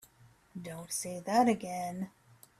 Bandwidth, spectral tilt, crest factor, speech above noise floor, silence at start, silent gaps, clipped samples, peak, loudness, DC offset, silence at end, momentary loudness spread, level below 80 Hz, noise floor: 16 kHz; -4.5 dB/octave; 20 dB; 30 dB; 0.55 s; none; under 0.1%; -14 dBFS; -33 LUFS; under 0.1%; 0.5 s; 17 LU; -72 dBFS; -63 dBFS